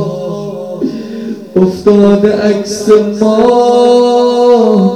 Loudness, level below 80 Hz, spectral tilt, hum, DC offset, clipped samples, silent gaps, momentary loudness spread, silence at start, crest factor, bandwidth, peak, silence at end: -9 LUFS; -46 dBFS; -6.5 dB/octave; none; under 0.1%; 1%; none; 13 LU; 0 s; 8 dB; 12.5 kHz; 0 dBFS; 0 s